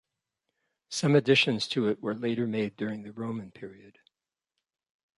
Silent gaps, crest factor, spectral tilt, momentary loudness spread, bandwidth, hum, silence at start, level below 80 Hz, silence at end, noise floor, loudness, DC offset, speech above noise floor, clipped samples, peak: none; 22 dB; -5 dB/octave; 16 LU; 11.5 kHz; none; 0.9 s; -72 dBFS; 1.3 s; -88 dBFS; -28 LUFS; under 0.1%; 60 dB; under 0.1%; -10 dBFS